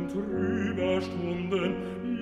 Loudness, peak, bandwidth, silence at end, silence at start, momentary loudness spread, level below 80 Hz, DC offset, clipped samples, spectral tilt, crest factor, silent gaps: -30 LUFS; -16 dBFS; 11 kHz; 0 s; 0 s; 4 LU; -54 dBFS; under 0.1%; under 0.1%; -7 dB/octave; 12 dB; none